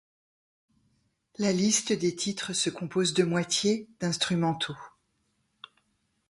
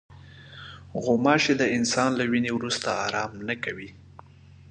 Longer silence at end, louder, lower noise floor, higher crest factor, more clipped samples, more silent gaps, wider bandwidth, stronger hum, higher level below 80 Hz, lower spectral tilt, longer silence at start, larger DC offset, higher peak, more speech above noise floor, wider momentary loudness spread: first, 1.4 s vs 0.75 s; about the same, -27 LUFS vs -25 LUFS; first, -74 dBFS vs -50 dBFS; about the same, 20 dB vs 22 dB; neither; neither; first, 11.5 kHz vs 9.8 kHz; neither; second, -68 dBFS vs -58 dBFS; about the same, -3.5 dB/octave vs -4 dB/octave; first, 1.4 s vs 0.1 s; neither; second, -10 dBFS vs -4 dBFS; first, 47 dB vs 25 dB; second, 7 LU vs 22 LU